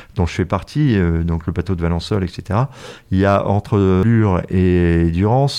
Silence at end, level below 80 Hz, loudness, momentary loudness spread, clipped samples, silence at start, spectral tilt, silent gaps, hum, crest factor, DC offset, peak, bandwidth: 0 s; -36 dBFS; -17 LUFS; 7 LU; under 0.1%; 0 s; -8 dB/octave; none; none; 14 dB; under 0.1%; -2 dBFS; 10.5 kHz